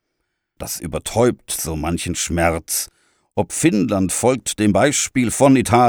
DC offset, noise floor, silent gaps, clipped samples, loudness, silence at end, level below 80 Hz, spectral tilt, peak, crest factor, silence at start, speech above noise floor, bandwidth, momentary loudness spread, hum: under 0.1%; -74 dBFS; none; under 0.1%; -18 LUFS; 0 s; -44 dBFS; -4.5 dB/octave; -2 dBFS; 16 dB; 0.6 s; 57 dB; over 20 kHz; 11 LU; none